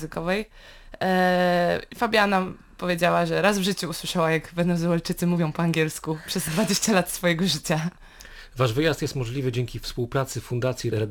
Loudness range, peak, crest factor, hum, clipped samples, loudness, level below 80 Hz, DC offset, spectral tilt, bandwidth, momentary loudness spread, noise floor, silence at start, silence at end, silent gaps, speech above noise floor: 4 LU; -6 dBFS; 18 dB; none; under 0.1%; -24 LUFS; -48 dBFS; under 0.1%; -5 dB/octave; 19 kHz; 8 LU; -44 dBFS; 0 s; 0 s; none; 20 dB